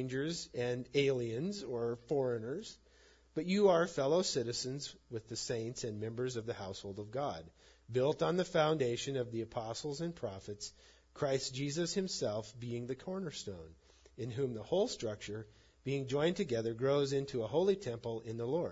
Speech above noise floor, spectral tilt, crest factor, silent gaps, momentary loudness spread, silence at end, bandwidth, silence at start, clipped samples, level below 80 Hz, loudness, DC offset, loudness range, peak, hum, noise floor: 29 dB; -5 dB/octave; 20 dB; none; 12 LU; 0 s; 8 kHz; 0 s; under 0.1%; -66 dBFS; -37 LUFS; under 0.1%; 5 LU; -18 dBFS; none; -65 dBFS